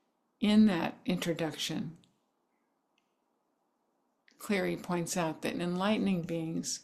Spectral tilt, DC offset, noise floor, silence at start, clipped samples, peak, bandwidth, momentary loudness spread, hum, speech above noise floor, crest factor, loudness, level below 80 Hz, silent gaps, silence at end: -5 dB/octave; under 0.1%; -78 dBFS; 0.4 s; under 0.1%; -14 dBFS; 14 kHz; 10 LU; none; 47 dB; 18 dB; -32 LUFS; -68 dBFS; none; 0.05 s